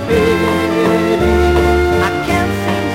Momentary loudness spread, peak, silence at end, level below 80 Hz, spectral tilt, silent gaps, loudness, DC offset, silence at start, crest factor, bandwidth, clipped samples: 4 LU; 0 dBFS; 0 s; -24 dBFS; -6 dB/octave; none; -13 LUFS; under 0.1%; 0 s; 12 dB; 16 kHz; under 0.1%